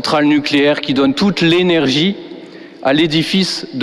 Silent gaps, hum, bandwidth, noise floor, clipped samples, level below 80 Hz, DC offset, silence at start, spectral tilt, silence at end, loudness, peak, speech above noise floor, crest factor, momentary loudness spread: none; none; 13 kHz; -34 dBFS; under 0.1%; -50 dBFS; under 0.1%; 0 s; -5 dB/octave; 0 s; -13 LUFS; -2 dBFS; 20 dB; 12 dB; 8 LU